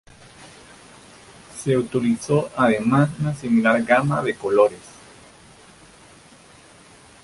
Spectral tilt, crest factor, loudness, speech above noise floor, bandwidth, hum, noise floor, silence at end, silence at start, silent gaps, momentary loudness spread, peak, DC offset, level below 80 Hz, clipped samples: -6.5 dB/octave; 20 dB; -20 LUFS; 29 dB; 11.5 kHz; none; -48 dBFS; 2.45 s; 0.4 s; none; 7 LU; -2 dBFS; under 0.1%; -56 dBFS; under 0.1%